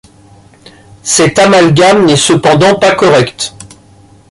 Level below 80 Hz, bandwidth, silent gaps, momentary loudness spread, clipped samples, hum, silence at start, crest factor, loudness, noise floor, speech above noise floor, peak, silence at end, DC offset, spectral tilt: -44 dBFS; 11.5 kHz; none; 11 LU; under 0.1%; none; 1.05 s; 10 dB; -7 LUFS; -40 dBFS; 33 dB; 0 dBFS; 0.65 s; under 0.1%; -4 dB/octave